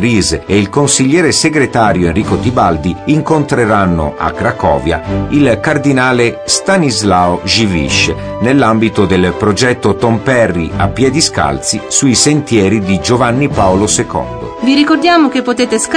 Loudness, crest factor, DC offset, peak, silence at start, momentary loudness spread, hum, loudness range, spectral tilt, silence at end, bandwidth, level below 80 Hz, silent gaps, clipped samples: -11 LUFS; 10 dB; under 0.1%; 0 dBFS; 0 s; 5 LU; none; 1 LU; -4.5 dB/octave; 0 s; 10.5 kHz; -32 dBFS; none; under 0.1%